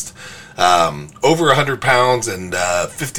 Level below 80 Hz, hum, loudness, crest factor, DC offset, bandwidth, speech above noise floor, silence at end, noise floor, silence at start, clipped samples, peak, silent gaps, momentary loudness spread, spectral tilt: -50 dBFS; none; -16 LUFS; 16 dB; 1%; 19.5 kHz; 20 dB; 0 s; -36 dBFS; 0 s; under 0.1%; 0 dBFS; none; 10 LU; -3.5 dB/octave